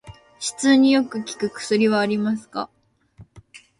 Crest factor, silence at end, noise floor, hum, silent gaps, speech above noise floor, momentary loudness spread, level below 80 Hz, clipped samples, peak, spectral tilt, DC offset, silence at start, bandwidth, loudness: 18 dB; 0.25 s; -50 dBFS; none; none; 30 dB; 15 LU; -60 dBFS; under 0.1%; -4 dBFS; -4 dB/octave; under 0.1%; 0.05 s; 11.5 kHz; -21 LUFS